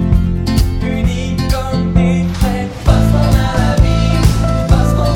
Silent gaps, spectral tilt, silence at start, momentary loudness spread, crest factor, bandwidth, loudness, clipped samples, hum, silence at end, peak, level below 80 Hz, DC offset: none; -7 dB/octave; 0 s; 5 LU; 12 dB; 16.5 kHz; -14 LUFS; 0.4%; none; 0 s; 0 dBFS; -16 dBFS; under 0.1%